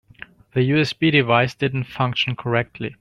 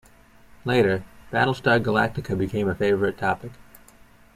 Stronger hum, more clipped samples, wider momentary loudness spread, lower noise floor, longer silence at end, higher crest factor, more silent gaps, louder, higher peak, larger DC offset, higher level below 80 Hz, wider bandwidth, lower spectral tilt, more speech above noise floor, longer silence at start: neither; neither; about the same, 8 LU vs 9 LU; second, -44 dBFS vs -52 dBFS; second, 0.05 s vs 0.75 s; about the same, 18 dB vs 20 dB; neither; first, -20 LUFS vs -23 LUFS; about the same, -2 dBFS vs -4 dBFS; neither; about the same, -54 dBFS vs -52 dBFS; second, 11 kHz vs 15.5 kHz; about the same, -6.5 dB/octave vs -7 dB/octave; second, 24 dB vs 29 dB; about the same, 0.55 s vs 0.65 s